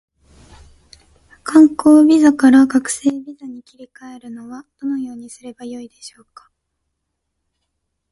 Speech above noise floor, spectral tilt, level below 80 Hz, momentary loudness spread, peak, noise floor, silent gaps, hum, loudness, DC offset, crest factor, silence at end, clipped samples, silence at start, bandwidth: 59 dB; -4 dB/octave; -56 dBFS; 25 LU; 0 dBFS; -75 dBFS; none; none; -13 LUFS; under 0.1%; 18 dB; 2.05 s; under 0.1%; 1.45 s; 11.5 kHz